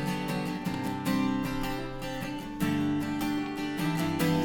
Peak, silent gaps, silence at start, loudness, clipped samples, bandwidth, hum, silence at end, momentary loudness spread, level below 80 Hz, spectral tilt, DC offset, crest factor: -14 dBFS; none; 0 s; -31 LUFS; under 0.1%; 19.5 kHz; none; 0 s; 7 LU; -48 dBFS; -6 dB/octave; under 0.1%; 16 dB